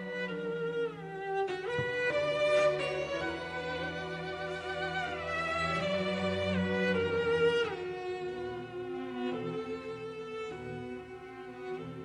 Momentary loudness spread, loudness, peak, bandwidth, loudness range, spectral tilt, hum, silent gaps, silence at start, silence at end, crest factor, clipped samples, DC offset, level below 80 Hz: 13 LU; -34 LUFS; -18 dBFS; 10.5 kHz; 8 LU; -5.5 dB/octave; none; none; 0 s; 0 s; 16 dB; under 0.1%; under 0.1%; -62 dBFS